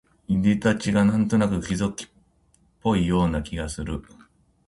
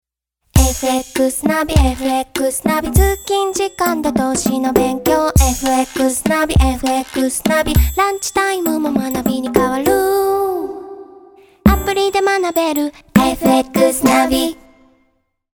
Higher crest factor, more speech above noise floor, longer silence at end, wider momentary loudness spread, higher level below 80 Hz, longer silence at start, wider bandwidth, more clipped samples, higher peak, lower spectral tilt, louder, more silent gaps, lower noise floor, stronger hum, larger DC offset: about the same, 16 dB vs 16 dB; second, 40 dB vs 51 dB; second, 0.65 s vs 1 s; first, 12 LU vs 5 LU; second, -40 dBFS vs -24 dBFS; second, 0.3 s vs 0.55 s; second, 11.5 kHz vs over 20 kHz; neither; second, -8 dBFS vs 0 dBFS; first, -6.5 dB/octave vs -5 dB/octave; second, -23 LUFS vs -16 LUFS; neither; second, -62 dBFS vs -67 dBFS; neither; neither